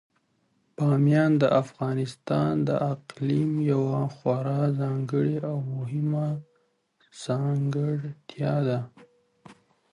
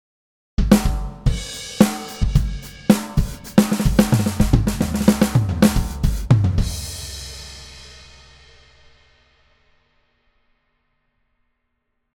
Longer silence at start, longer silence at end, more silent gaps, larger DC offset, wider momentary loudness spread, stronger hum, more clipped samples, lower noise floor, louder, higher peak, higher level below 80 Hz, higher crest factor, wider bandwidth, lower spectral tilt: first, 0.8 s vs 0.6 s; second, 0.4 s vs 4.15 s; neither; neither; second, 10 LU vs 15 LU; neither; neither; about the same, -70 dBFS vs -72 dBFS; second, -26 LUFS vs -20 LUFS; second, -10 dBFS vs 0 dBFS; second, -64 dBFS vs -28 dBFS; about the same, 18 dB vs 20 dB; second, 11 kHz vs 18.5 kHz; first, -8.5 dB/octave vs -6 dB/octave